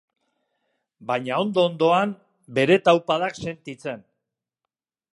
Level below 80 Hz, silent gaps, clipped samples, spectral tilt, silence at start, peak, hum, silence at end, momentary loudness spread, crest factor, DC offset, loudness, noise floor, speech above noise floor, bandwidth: -66 dBFS; none; under 0.1%; -6 dB/octave; 1 s; -2 dBFS; none; 1.15 s; 16 LU; 22 dB; under 0.1%; -21 LUFS; -86 dBFS; 64 dB; 11 kHz